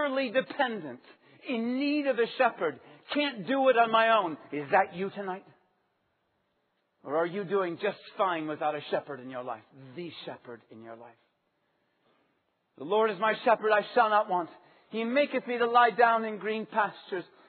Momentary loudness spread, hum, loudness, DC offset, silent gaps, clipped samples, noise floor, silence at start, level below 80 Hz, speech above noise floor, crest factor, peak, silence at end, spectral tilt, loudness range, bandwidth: 19 LU; none; -28 LUFS; under 0.1%; none; under 0.1%; -76 dBFS; 0 s; -86 dBFS; 47 dB; 22 dB; -8 dBFS; 0.25 s; -2 dB/octave; 11 LU; 4.6 kHz